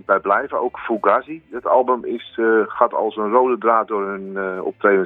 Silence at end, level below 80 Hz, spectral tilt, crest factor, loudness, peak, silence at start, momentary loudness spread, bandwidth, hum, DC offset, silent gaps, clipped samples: 0 s; -62 dBFS; -8.5 dB/octave; 18 dB; -19 LUFS; 0 dBFS; 0.1 s; 9 LU; 4 kHz; none; under 0.1%; none; under 0.1%